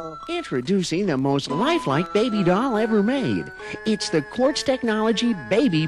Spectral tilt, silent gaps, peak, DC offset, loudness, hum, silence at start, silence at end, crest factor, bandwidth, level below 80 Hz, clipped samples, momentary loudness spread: -5.5 dB/octave; none; -10 dBFS; under 0.1%; -22 LUFS; none; 0 s; 0 s; 12 dB; 12 kHz; -54 dBFS; under 0.1%; 6 LU